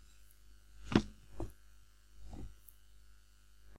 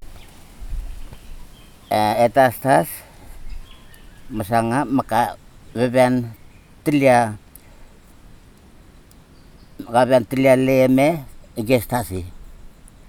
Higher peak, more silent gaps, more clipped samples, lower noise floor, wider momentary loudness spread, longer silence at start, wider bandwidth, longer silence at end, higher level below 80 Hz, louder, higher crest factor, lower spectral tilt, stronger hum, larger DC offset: second, -10 dBFS vs -2 dBFS; neither; neither; first, -64 dBFS vs -46 dBFS; first, 26 LU vs 21 LU; about the same, 0.05 s vs 0 s; second, 16 kHz vs 20 kHz; second, 0 s vs 0.2 s; second, -54 dBFS vs -40 dBFS; second, -40 LUFS vs -18 LUFS; first, 32 dB vs 20 dB; about the same, -6.5 dB/octave vs -6 dB/octave; first, 50 Hz at -55 dBFS vs none; neither